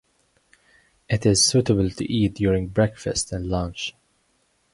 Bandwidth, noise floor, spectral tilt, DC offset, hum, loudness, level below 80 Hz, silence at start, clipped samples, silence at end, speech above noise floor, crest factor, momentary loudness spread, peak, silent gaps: 11.5 kHz; -67 dBFS; -4.5 dB/octave; under 0.1%; none; -22 LUFS; -42 dBFS; 1.1 s; under 0.1%; 0.85 s; 45 dB; 18 dB; 10 LU; -6 dBFS; none